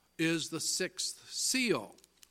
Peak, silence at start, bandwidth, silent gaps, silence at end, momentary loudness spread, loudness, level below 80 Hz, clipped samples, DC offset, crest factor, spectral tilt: -16 dBFS; 0.2 s; 16.5 kHz; none; 0.35 s; 6 LU; -33 LUFS; -76 dBFS; under 0.1%; under 0.1%; 18 dB; -2.5 dB/octave